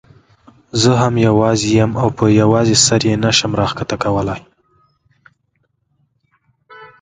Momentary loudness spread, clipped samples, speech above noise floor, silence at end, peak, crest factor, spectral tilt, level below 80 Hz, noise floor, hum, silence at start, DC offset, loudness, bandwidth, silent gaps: 9 LU; under 0.1%; 52 dB; 0.15 s; 0 dBFS; 16 dB; -4.5 dB/octave; -42 dBFS; -65 dBFS; none; 0.75 s; under 0.1%; -14 LUFS; 9.6 kHz; none